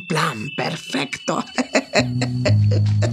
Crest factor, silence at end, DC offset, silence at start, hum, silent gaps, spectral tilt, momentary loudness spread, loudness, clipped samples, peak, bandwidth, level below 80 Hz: 18 dB; 0 s; under 0.1%; 0 s; none; none; -5.5 dB/octave; 7 LU; -21 LUFS; under 0.1%; -2 dBFS; 12 kHz; -50 dBFS